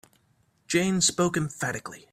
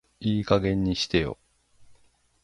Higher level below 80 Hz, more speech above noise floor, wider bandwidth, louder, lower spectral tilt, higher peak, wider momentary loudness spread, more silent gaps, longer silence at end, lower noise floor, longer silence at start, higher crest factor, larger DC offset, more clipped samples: second, -60 dBFS vs -46 dBFS; first, 41 dB vs 37 dB; first, 15.5 kHz vs 11.5 kHz; about the same, -26 LUFS vs -26 LUFS; second, -3.5 dB/octave vs -6 dB/octave; second, -10 dBFS vs -6 dBFS; about the same, 9 LU vs 9 LU; neither; second, 0.15 s vs 0.5 s; first, -67 dBFS vs -61 dBFS; first, 0.7 s vs 0.2 s; about the same, 18 dB vs 22 dB; neither; neither